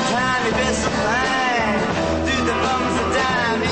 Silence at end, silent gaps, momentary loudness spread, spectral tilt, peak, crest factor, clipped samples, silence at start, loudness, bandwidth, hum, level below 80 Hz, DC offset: 0 s; none; 2 LU; -4 dB/octave; -8 dBFS; 10 dB; under 0.1%; 0 s; -19 LUFS; 8.8 kHz; none; -36 dBFS; under 0.1%